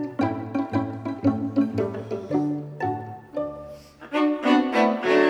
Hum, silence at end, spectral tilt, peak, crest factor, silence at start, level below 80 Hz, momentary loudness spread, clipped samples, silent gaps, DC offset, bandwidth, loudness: none; 0 s; -7 dB/octave; -6 dBFS; 18 dB; 0 s; -64 dBFS; 13 LU; under 0.1%; none; under 0.1%; 9.6 kHz; -25 LUFS